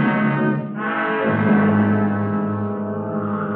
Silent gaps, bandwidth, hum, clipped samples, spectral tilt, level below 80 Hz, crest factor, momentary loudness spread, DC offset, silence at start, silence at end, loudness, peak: none; 4 kHz; none; under 0.1%; -11.5 dB/octave; -66 dBFS; 14 dB; 8 LU; under 0.1%; 0 s; 0 s; -20 LUFS; -6 dBFS